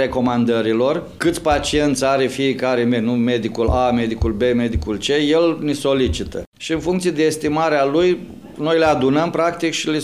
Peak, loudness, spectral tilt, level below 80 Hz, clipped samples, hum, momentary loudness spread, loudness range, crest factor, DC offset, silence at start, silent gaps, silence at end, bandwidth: -4 dBFS; -18 LUFS; -5 dB/octave; -34 dBFS; under 0.1%; none; 5 LU; 1 LU; 12 dB; 0.2%; 0 s; 6.46-6.52 s; 0 s; 15 kHz